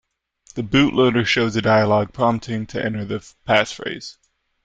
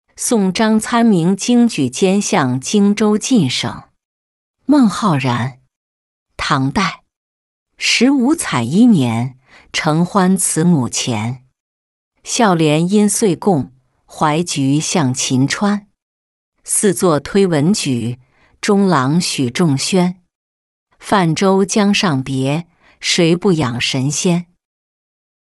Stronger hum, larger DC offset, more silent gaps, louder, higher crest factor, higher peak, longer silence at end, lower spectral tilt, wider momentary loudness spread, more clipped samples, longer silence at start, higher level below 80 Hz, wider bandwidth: neither; neither; second, none vs 4.05-4.54 s, 5.76-6.26 s, 7.16-7.66 s, 11.60-12.11 s, 16.02-16.52 s, 20.35-20.87 s; second, -19 LUFS vs -15 LUFS; about the same, 18 dB vs 14 dB; about the same, -2 dBFS vs -2 dBFS; second, 0.55 s vs 1.15 s; about the same, -5.5 dB/octave vs -4.5 dB/octave; first, 14 LU vs 9 LU; neither; first, 0.55 s vs 0.2 s; about the same, -48 dBFS vs -50 dBFS; second, 9.2 kHz vs 12.5 kHz